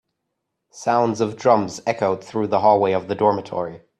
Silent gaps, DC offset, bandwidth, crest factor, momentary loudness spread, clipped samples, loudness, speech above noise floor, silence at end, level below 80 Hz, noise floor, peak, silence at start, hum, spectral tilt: none; under 0.1%; 11 kHz; 18 dB; 9 LU; under 0.1%; -20 LUFS; 58 dB; 0.25 s; -64 dBFS; -78 dBFS; -2 dBFS; 0.75 s; none; -6 dB/octave